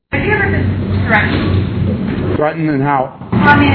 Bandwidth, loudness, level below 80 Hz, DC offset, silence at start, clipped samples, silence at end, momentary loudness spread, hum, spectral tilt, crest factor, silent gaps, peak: 5.4 kHz; -14 LUFS; -32 dBFS; under 0.1%; 0.1 s; 0.2%; 0 s; 6 LU; none; -9.5 dB/octave; 14 dB; none; 0 dBFS